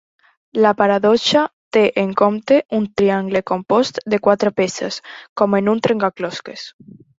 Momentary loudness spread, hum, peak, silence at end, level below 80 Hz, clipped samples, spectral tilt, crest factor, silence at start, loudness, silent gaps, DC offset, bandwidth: 12 LU; none; -2 dBFS; 0.5 s; -58 dBFS; under 0.1%; -5 dB/octave; 16 dB; 0.55 s; -17 LUFS; 1.53-1.71 s, 2.65-2.69 s, 5.29-5.36 s; under 0.1%; 8 kHz